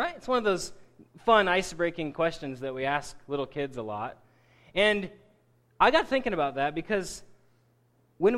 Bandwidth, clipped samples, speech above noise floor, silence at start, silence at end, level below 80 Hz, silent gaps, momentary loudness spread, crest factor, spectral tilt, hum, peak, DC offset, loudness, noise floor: 13.5 kHz; under 0.1%; 39 dB; 0 s; 0 s; -54 dBFS; none; 13 LU; 22 dB; -4 dB/octave; none; -8 dBFS; under 0.1%; -28 LUFS; -66 dBFS